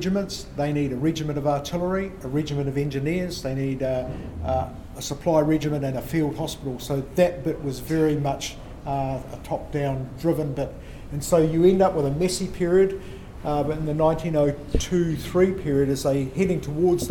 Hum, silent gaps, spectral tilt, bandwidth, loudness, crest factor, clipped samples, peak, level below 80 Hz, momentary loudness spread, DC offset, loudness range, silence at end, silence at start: none; none; -6.5 dB/octave; 18 kHz; -24 LUFS; 18 dB; under 0.1%; -6 dBFS; -40 dBFS; 11 LU; under 0.1%; 4 LU; 0 s; 0 s